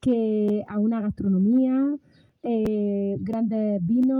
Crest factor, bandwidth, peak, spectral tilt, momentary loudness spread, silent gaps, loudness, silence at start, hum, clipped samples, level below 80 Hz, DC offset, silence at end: 10 dB; 4.7 kHz; -12 dBFS; -10 dB/octave; 7 LU; none; -24 LUFS; 0.05 s; none; under 0.1%; -54 dBFS; under 0.1%; 0 s